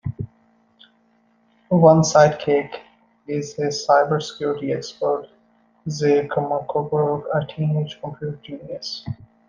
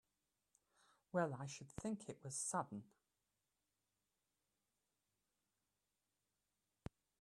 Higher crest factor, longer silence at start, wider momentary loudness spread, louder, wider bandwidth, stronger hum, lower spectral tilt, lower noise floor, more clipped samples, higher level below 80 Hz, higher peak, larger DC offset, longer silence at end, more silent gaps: about the same, 20 dB vs 24 dB; second, 0.05 s vs 1.15 s; about the same, 18 LU vs 16 LU; first, -21 LUFS vs -46 LUFS; second, 7.6 kHz vs 12.5 kHz; neither; first, -6 dB/octave vs -4.5 dB/octave; second, -61 dBFS vs under -90 dBFS; neither; first, -58 dBFS vs -76 dBFS; first, -2 dBFS vs -26 dBFS; neither; second, 0.35 s vs 4.35 s; neither